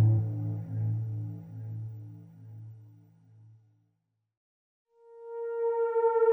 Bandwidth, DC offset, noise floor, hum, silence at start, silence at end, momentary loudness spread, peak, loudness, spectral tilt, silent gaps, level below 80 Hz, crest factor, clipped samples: 2.4 kHz; under 0.1%; -79 dBFS; none; 0 s; 0 s; 23 LU; -16 dBFS; -32 LUFS; -12 dB/octave; 4.37-4.85 s; -72 dBFS; 16 dB; under 0.1%